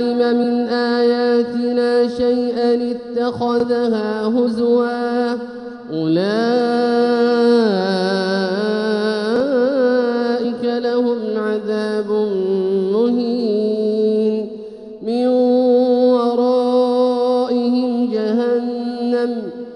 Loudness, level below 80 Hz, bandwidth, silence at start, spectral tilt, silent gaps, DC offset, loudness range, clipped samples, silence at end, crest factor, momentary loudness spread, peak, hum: -17 LUFS; -60 dBFS; 10.5 kHz; 0 s; -7 dB/octave; none; under 0.1%; 3 LU; under 0.1%; 0 s; 12 dB; 6 LU; -4 dBFS; none